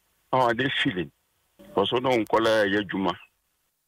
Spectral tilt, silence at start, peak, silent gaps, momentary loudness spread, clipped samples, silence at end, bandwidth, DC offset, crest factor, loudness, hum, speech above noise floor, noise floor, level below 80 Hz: -5.5 dB/octave; 0.3 s; -10 dBFS; none; 10 LU; under 0.1%; 0.7 s; 16 kHz; under 0.1%; 16 dB; -24 LUFS; none; 50 dB; -73 dBFS; -60 dBFS